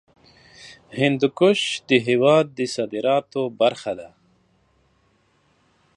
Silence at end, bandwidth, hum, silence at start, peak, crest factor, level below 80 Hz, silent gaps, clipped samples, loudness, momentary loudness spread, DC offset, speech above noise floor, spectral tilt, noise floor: 1.9 s; 11 kHz; none; 0.6 s; -2 dBFS; 20 dB; -68 dBFS; none; under 0.1%; -20 LUFS; 13 LU; under 0.1%; 43 dB; -5 dB/octave; -63 dBFS